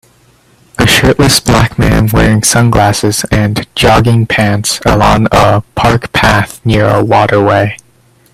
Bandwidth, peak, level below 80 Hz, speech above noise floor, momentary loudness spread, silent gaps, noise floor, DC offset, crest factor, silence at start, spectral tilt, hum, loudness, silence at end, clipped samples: 15.5 kHz; 0 dBFS; -24 dBFS; 38 dB; 5 LU; none; -46 dBFS; under 0.1%; 8 dB; 0.8 s; -4.5 dB/octave; none; -9 LUFS; 0.6 s; 0.1%